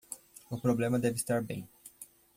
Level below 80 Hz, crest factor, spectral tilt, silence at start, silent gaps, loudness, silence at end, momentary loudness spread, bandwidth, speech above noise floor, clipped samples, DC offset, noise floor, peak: -64 dBFS; 18 dB; -6 dB/octave; 0.1 s; none; -32 LUFS; 0.3 s; 20 LU; 16.5 kHz; 23 dB; under 0.1%; under 0.1%; -54 dBFS; -16 dBFS